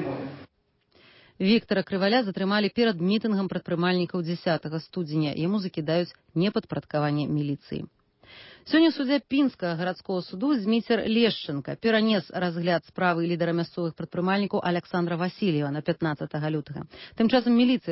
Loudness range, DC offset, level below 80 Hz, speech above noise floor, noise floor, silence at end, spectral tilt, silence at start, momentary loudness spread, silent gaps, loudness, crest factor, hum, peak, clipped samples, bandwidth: 3 LU; under 0.1%; -64 dBFS; 42 dB; -68 dBFS; 0 s; -10.5 dB/octave; 0 s; 10 LU; none; -26 LUFS; 16 dB; none; -10 dBFS; under 0.1%; 5.8 kHz